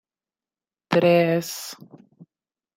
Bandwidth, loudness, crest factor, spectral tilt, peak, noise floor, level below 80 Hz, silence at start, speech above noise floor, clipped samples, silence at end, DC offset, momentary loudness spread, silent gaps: 16 kHz; -21 LUFS; 20 dB; -5.5 dB/octave; -4 dBFS; under -90 dBFS; -70 dBFS; 0.9 s; over 69 dB; under 0.1%; 1.05 s; under 0.1%; 19 LU; none